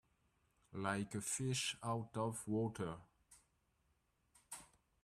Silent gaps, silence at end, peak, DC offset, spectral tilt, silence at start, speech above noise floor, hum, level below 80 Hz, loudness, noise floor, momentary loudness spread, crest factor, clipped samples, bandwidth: none; 0.4 s; -24 dBFS; under 0.1%; -4 dB/octave; 0.7 s; 39 dB; none; -74 dBFS; -42 LUFS; -81 dBFS; 15 LU; 22 dB; under 0.1%; 15 kHz